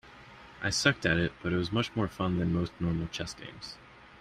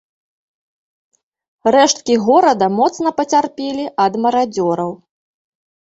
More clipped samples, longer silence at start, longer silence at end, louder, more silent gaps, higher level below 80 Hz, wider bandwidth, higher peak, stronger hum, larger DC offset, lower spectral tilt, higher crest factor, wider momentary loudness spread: neither; second, 0.05 s vs 1.65 s; second, 0.05 s vs 1 s; second, -30 LUFS vs -15 LUFS; neither; first, -52 dBFS vs -60 dBFS; first, 13 kHz vs 8.2 kHz; second, -10 dBFS vs -2 dBFS; neither; neither; about the same, -5 dB/octave vs -4 dB/octave; first, 22 dB vs 16 dB; first, 19 LU vs 10 LU